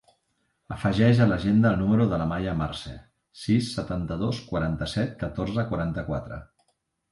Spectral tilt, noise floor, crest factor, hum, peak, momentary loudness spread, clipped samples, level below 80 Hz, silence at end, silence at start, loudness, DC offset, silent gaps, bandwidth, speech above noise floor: -7.5 dB/octave; -73 dBFS; 18 dB; none; -8 dBFS; 13 LU; under 0.1%; -44 dBFS; 0.7 s; 0.7 s; -25 LUFS; under 0.1%; none; 11.5 kHz; 49 dB